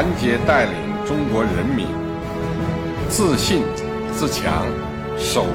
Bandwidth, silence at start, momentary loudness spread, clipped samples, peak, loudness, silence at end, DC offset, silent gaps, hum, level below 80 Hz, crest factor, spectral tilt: 17 kHz; 0 s; 8 LU; under 0.1%; -6 dBFS; -21 LUFS; 0 s; under 0.1%; none; none; -36 dBFS; 14 dB; -5 dB/octave